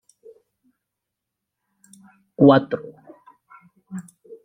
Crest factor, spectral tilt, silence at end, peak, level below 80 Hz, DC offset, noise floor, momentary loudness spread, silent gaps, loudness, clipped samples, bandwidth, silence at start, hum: 24 dB; -8 dB/octave; 0.45 s; -2 dBFS; -66 dBFS; under 0.1%; -83 dBFS; 27 LU; none; -17 LUFS; under 0.1%; 11 kHz; 2.4 s; none